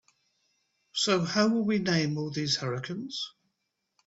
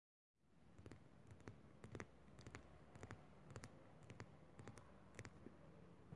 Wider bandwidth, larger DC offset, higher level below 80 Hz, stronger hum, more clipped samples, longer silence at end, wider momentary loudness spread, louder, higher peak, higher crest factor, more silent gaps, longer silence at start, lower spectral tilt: second, 8 kHz vs 11 kHz; neither; first, -68 dBFS vs -76 dBFS; neither; neither; first, 0.8 s vs 0 s; first, 11 LU vs 6 LU; first, -28 LUFS vs -62 LUFS; first, -10 dBFS vs -32 dBFS; second, 20 dB vs 30 dB; neither; first, 0.95 s vs 0.35 s; about the same, -4.5 dB/octave vs -5.5 dB/octave